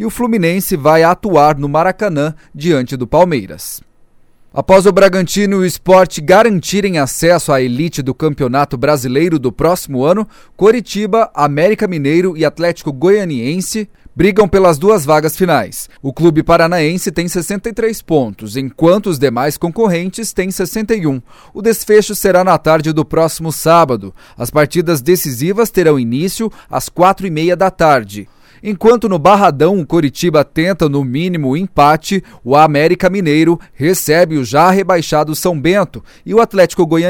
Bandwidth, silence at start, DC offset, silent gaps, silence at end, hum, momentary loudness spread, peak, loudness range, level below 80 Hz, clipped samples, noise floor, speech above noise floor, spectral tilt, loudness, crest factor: 19 kHz; 0 s; under 0.1%; none; 0 s; none; 9 LU; 0 dBFS; 3 LU; -38 dBFS; 0.1%; -45 dBFS; 33 dB; -5.5 dB/octave; -12 LUFS; 12 dB